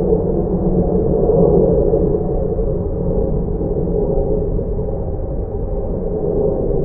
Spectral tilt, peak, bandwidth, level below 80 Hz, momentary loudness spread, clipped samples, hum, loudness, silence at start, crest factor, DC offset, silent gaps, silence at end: -17 dB/octave; -2 dBFS; 1.9 kHz; -22 dBFS; 9 LU; under 0.1%; none; -18 LUFS; 0 s; 14 dB; under 0.1%; none; 0 s